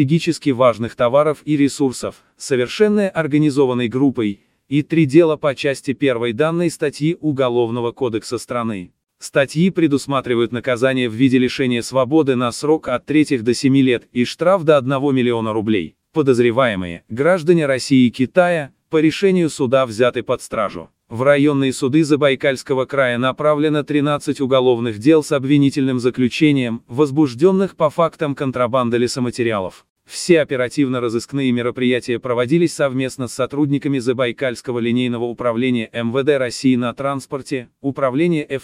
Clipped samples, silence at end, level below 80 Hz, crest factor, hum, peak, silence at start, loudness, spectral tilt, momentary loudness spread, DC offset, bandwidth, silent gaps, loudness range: under 0.1%; 0.05 s; -58 dBFS; 16 dB; none; 0 dBFS; 0 s; -17 LUFS; -6 dB/octave; 8 LU; under 0.1%; 14 kHz; 29.90-29.96 s; 3 LU